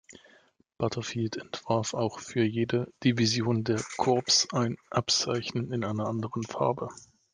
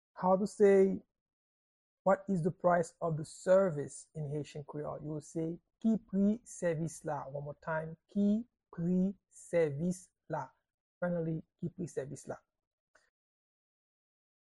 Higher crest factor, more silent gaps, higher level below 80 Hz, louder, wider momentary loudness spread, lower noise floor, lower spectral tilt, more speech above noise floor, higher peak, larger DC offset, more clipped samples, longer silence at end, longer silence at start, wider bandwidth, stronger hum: about the same, 20 dB vs 18 dB; second, none vs 1.21-1.26 s, 1.33-2.05 s, 10.74-11.01 s; about the same, -66 dBFS vs -68 dBFS; first, -29 LUFS vs -34 LUFS; second, 10 LU vs 15 LU; second, -63 dBFS vs under -90 dBFS; second, -4.5 dB/octave vs -7.5 dB/octave; second, 34 dB vs over 57 dB; first, -10 dBFS vs -16 dBFS; neither; neither; second, 0.35 s vs 2.05 s; about the same, 0.1 s vs 0.15 s; about the same, 10.5 kHz vs 11.5 kHz; neither